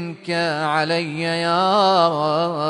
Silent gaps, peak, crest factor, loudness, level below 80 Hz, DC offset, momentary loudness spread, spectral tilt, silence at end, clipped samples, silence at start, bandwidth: none; -2 dBFS; 16 dB; -19 LUFS; -64 dBFS; under 0.1%; 7 LU; -5 dB/octave; 0 s; under 0.1%; 0 s; 10.5 kHz